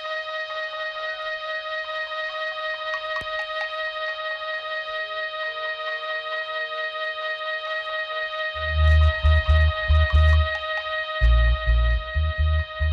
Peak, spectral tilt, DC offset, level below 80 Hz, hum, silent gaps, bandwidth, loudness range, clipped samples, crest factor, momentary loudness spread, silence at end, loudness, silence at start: -10 dBFS; -6 dB/octave; under 0.1%; -26 dBFS; 50 Hz at -65 dBFS; none; 6 kHz; 7 LU; under 0.1%; 14 dB; 9 LU; 0 s; -24 LUFS; 0 s